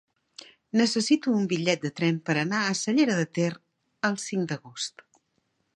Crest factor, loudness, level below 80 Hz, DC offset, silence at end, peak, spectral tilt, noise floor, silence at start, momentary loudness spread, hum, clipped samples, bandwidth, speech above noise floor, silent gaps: 20 dB; -26 LUFS; -74 dBFS; under 0.1%; 0.85 s; -8 dBFS; -4.5 dB/octave; -74 dBFS; 0.75 s; 11 LU; none; under 0.1%; 11.5 kHz; 48 dB; none